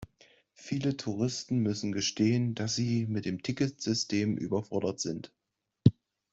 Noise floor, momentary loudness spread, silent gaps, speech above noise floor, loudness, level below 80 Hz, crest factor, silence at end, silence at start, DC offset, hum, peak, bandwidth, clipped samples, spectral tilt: -63 dBFS; 8 LU; none; 33 dB; -31 LUFS; -64 dBFS; 26 dB; 0.4 s; 0 s; under 0.1%; none; -6 dBFS; 8 kHz; under 0.1%; -5.5 dB/octave